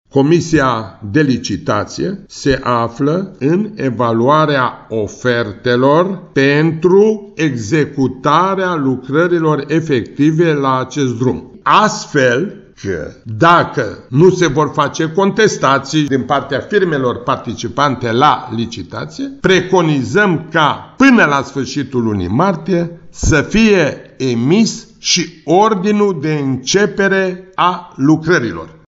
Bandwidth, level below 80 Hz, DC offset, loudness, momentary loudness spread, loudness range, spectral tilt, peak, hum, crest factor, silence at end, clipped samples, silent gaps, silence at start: 8 kHz; -38 dBFS; under 0.1%; -14 LUFS; 9 LU; 2 LU; -5.5 dB/octave; 0 dBFS; none; 14 dB; 0.2 s; under 0.1%; none; 0.15 s